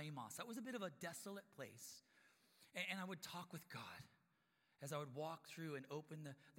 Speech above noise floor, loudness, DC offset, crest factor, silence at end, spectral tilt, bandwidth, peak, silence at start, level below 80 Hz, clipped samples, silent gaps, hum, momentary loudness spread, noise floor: 31 dB; -52 LUFS; under 0.1%; 20 dB; 0 s; -4 dB/octave; 16.5 kHz; -32 dBFS; 0 s; under -90 dBFS; under 0.1%; none; none; 10 LU; -83 dBFS